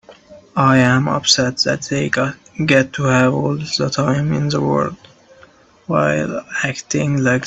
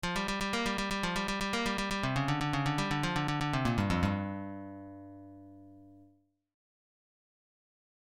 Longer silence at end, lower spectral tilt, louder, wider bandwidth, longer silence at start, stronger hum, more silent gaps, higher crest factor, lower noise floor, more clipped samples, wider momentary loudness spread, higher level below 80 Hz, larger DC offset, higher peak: second, 0 s vs 2 s; about the same, -4.5 dB/octave vs -5 dB/octave; first, -17 LUFS vs -32 LUFS; second, 8.4 kHz vs 16.5 kHz; about the same, 0.1 s vs 0.05 s; second, none vs 50 Hz at -55 dBFS; neither; about the same, 18 dB vs 18 dB; second, -48 dBFS vs -67 dBFS; neither; second, 7 LU vs 18 LU; about the same, -50 dBFS vs -50 dBFS; neither; first, 0 dBFS vs -16 dBFS